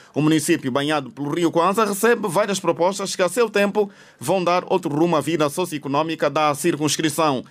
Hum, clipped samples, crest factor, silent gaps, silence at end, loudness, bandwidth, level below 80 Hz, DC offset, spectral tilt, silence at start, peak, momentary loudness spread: none; under 0.1%; 14 dB; none; 0.05 s; -20 LUFS; 16 kHz; -66 dBFS; under 0.1%; -4.5 dB/octave; 0.15 s; -6 dBFS; 5 LU